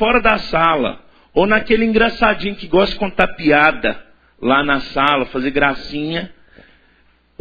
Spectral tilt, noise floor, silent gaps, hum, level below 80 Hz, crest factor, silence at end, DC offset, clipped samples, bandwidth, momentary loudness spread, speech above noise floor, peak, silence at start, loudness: -7 dB/octave; -55 dBFS; none; none; -36 dBFS; 16 dB; 1.1 s; under 0.1%; under 0.1%; 5.4 kHz; 10 LU; 39 dB; 0 dBFS; 0 s; -16 LUFS